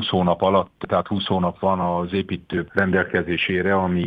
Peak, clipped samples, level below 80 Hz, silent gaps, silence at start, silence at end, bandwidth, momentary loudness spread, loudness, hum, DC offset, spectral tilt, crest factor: -4 dBFS; under 0.1%; -50 dBFS; none; 0 s; 0 s; 5 kHz; 5 LU; -21 LUFS; none; under 0.1%; -8.5 dB/octave; 18 dB